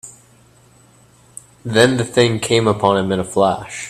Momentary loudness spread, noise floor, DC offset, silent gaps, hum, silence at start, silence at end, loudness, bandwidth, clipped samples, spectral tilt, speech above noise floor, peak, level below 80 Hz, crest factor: 5 LU; -50 dBFS; under 0.1%; none; none; 0.05 s; 0 s; -16 LUFS; 14 kHz; under 0.1%; -5 dB/octave; 34 dB; 0 dBFS; -52 dBFS; 18 dB